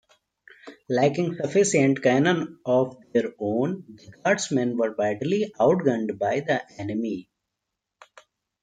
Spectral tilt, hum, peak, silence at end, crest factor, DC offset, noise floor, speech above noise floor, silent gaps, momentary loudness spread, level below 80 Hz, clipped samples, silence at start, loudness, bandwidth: -5.5 dB/octave; none; -6 dBFS; 1.4 s; 18 dB; under 0.1%; -83 dBFS; 60 dB; none; 9 LU; -68 dBFS; under 0.1%; 0.65 s; -24 LUFS; 9.4 kHz